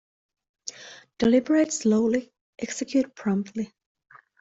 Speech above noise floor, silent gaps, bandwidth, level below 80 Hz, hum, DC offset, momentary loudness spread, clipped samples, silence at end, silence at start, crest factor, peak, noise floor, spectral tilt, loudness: 24 dB; 2.41-2.53 s; 8.2 kHz; -64 dBFS; none; under 0.1%; 18 LU; under 0.1%; 0.75 s; 0.65 s; 18 dB; -10 dBFS; -47 dBFS; -5 dB/octave; -25 LUFS